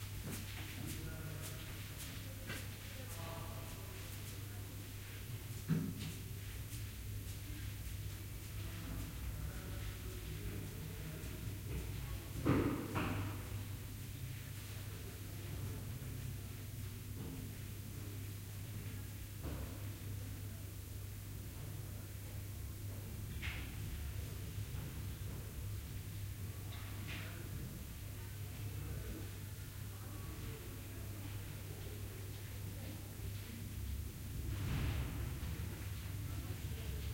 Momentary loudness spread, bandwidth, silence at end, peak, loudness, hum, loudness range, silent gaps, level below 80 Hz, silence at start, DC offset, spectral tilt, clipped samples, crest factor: 6 LU; 16.5 kHz; 0 s; -20 dBFS; -46 LUFS; none; 6 LU; none; -52 dBFS; 0 s; under 0.1%; -5 dB/octave; under 0.1%; 24 dB